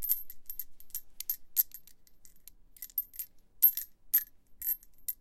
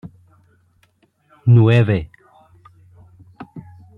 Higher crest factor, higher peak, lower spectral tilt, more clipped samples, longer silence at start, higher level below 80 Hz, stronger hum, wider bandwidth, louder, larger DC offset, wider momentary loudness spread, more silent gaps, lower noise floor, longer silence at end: first, 26 dB vs 18 dB; second, -10 dBFS vs -2 dBFS; second, 1.5 dB/octave vs -9.5 dB/octave; neither; about the same, 0 s vs 0.05 s; second, -62 dBFS vs -50 dBFS; neither; first, 17 kHz vs 4.2 kHz; second, -31 LUFS vs -15 LUFS; neither; second, 18 LU vs 26 LU; neither; second, -54 dBFS vs -60 dBFS; second, 0.05 s vs 0.4 s